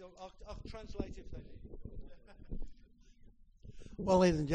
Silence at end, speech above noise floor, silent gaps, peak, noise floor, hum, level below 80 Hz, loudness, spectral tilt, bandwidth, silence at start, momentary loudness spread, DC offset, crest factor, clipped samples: 0 s; 24 dB; none; -16 dBFS; -60 dBFS; none; -50 dBFS; -34 LUFS; -6.5 dB/octave; 9.4 kHz; 0 s; 28 LU; under 0.1%; 22 dB; under 0.1%